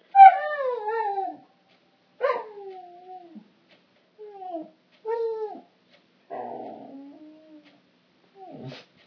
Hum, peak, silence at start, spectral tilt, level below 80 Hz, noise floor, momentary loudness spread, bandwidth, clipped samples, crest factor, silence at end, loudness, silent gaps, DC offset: none; 0 dBFS; 0.15 s; -6.5 dB/octave; under -90 dBFS; -63 dBFS; 20 LU; 5.4 kHz; under 0.1%; 26 dB; 0.25 s; -22 LUFS; none; under 0.1%